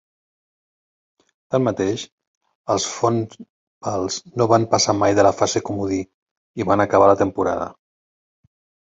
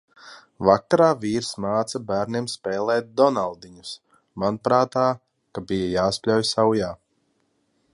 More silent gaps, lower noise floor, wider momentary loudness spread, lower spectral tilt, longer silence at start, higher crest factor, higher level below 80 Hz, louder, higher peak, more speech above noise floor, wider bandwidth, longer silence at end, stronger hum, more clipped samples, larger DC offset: first, 2.12-2.18 s, 2.28-2.41 s, 2.55-2.64 s, 3.49-3.81 s, 6.14-6.54 s vs none; first, under -90 dBFS vs -69 dBFS; about the same, 16 LU vs 18 LU; about the same, -4.5 dB/octave vs -5 dB/octave; first, 1.5 s vs 0.25 s; about the same, 20 dB vs 22 dB; about the same, -52 dBFS vs -54 dBFS; first, -19 LUFS vs -22 LUFS; about the same, -2 dBFS vs -2 dBFS; first, over 71 dB vs 47 dB; second, 8 kHz vs 11.5 kHz; about the same, 1.1 s vs 1 s; neither; neither; neither